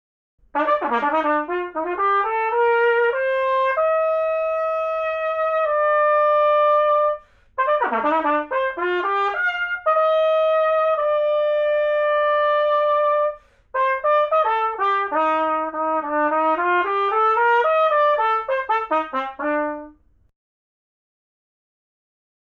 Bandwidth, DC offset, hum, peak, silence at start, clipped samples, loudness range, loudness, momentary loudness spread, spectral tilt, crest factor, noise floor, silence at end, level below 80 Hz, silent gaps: 5.6 kHz; under 0.1%; none; -8 dBFS; 0.55 s; under 0.1%; 2 LU; -20 LUFS; 6 LU; -4.5 dB/octave; 12 dB; -47 dBFS; 2.5 s; -58 dBFS; none